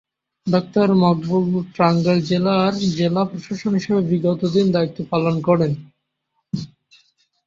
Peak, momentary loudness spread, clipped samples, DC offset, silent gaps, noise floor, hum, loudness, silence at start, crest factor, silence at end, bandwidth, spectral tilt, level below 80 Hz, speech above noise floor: -2 dBFS; 13 LU; under 0.1%; under 0.1%; none; -73 dBFS; none; -19 LUFS; 0.45 s; 16 dB; 0.8 s; 7.6 kHz; -7.5 dB/octave; -56 dBFS; 55 dB